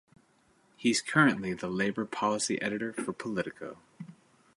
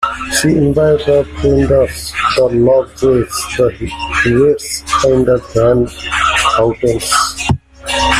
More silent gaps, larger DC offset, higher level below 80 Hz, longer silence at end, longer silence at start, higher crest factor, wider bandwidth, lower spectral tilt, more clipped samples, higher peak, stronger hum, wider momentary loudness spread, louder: neither; neither; second, -68 dBFS vs -30 dBFS; first, 0.45 s vs 0 s; first, 0.8 s vs 0 s; first, 22 dB vs 12 dB; second, 11.5 kHz vs 15.5 kHz; about the same, -4 dB/octave vs -4.5 dB/octave; neither; second, -10 dBFS vs 0 dBFS; neither; first, 22 LU vs 6 LU; second, -30 LUFS vs -13 LUFS